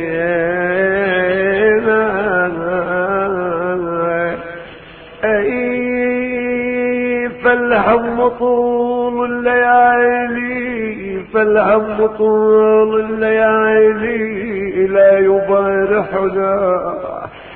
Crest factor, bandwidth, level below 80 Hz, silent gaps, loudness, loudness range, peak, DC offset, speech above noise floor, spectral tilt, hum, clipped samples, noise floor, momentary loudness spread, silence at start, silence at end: 14 dB; 4.2 kHz; -46 dBFS; none; -14 LUFS; 5 LU; -2 dBFS; under 0.1%; 24 dB; -11.5 dB/octave; none; under 0.1%; -36 dBFS; 9 LU; 0 s; 0 s